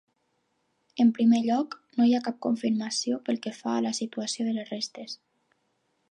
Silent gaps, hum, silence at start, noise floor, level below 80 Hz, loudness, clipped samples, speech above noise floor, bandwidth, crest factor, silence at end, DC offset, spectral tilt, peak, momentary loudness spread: none; none; 0.95 s; -74 dBFS; -82 dBFS; -27 LUFS; under 0.1%; 48 dB; 9.8 kHz; 16 dB; 0.95 s; under 0.1%; -4.5 dB/octave; -12 dBFS; 12 LU